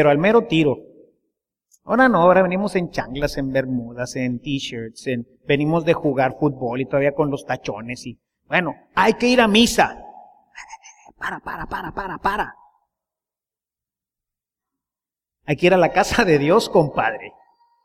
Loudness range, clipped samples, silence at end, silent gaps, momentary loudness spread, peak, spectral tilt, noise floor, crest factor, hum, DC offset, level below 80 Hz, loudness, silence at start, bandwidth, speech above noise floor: 10 LU; under 0.1%; 0.55 s; none; 16 LU; -2 dBFS; -5 dB/octave; under -90 dBFS; 20 dB; none; under 0.1%; -46 dBFS; -19 LUFS; 0 s; 16 kHz; over 71 dB